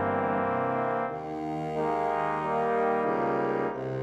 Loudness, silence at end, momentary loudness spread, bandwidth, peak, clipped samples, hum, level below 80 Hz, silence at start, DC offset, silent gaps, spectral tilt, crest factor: -29 LUFS; 0 s; 6 LU; 9 kHz; -14 dBFS; under 0.1%; none; -60 dBFS; 0 s; under 0.1%; none; -8 dB/octave; 14 dB